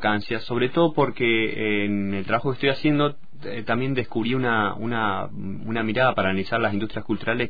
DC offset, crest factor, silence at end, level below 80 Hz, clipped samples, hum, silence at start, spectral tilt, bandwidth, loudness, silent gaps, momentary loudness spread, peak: 3%; 16 dB; 0 s; -54 dBFS; under 0.1%; none; 0 s; -8.5 dB/octave; 5 kHz; -24 LUFS; none; 8 LU; -8 dBFS